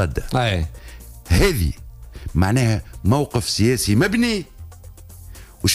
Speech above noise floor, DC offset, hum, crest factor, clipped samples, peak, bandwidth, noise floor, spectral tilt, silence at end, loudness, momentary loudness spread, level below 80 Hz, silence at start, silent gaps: 21 dB; under 0.1%; none; 16 dB; under 0.1%; -6 dBFS; 16 kHz; -40 dBFS; -5 dB/octave; 0 s; -20 LUFS; 23 LU; -32 dBFS; 0 s; none